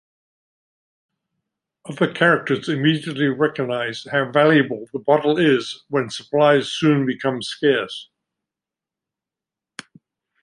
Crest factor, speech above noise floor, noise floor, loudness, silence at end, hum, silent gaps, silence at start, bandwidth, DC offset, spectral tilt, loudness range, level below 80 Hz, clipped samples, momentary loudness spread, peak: 20 dB; 69 dB; -88 dBFS; -19 LUFS; 2.4 s; none; none; 1.85 s; 11.5 kHz; under 0.1%; -6 dB/octave; 5 LU; -66 dBFS; under 0.1%; 12 LU; -2 dBFS